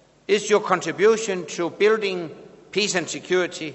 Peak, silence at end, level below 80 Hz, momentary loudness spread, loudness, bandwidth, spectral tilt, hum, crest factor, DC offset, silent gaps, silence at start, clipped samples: -4 dBFS; 0 s; -68 dBFS; 9 LU; -22 LUFS; 8.4 kHz; -3.5 dB/octave; none; 20 dB; under 0.1%; none; 0.3 s; under 0.1%